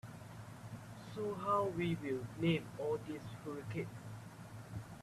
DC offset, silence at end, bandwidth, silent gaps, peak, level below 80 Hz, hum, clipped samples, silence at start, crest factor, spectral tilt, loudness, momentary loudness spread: under 0.1%; 0 s; 14 kHz; none; -24 dBFS; -68 dBFS; none; under 0.1%; 0.05 s; 18 dB; -7 dB/octave; -41 LUFS; 16 LU